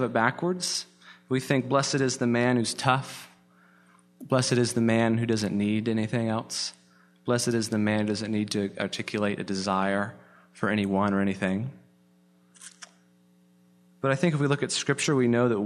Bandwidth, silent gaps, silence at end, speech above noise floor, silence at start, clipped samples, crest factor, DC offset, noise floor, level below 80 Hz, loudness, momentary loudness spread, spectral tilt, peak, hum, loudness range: 13.5 kHz; none; 0 s; 35 dB; 0 s; under 0.1%; 22 dB; under 0.1%; -61 dBFS; -68 dBFS; -26 LUFS; 8 LU; -5 dB/octave; -4 dBFS; 60 Hz at -50 dBFS; 4 LU